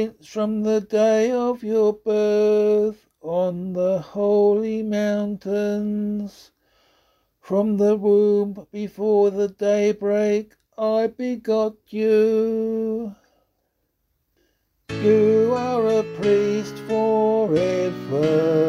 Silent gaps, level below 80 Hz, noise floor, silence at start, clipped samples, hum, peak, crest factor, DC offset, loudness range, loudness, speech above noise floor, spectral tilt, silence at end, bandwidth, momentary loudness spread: none; -60 dBFS; -72 dBFS; 0 s; under 0.1%; none; -6 dBFS; 14 dB; under 0.1%; 4 LU; -21 LUFS; 52 dB; -7 dB/octave; 0 s; 11.5 kHz; 9 LU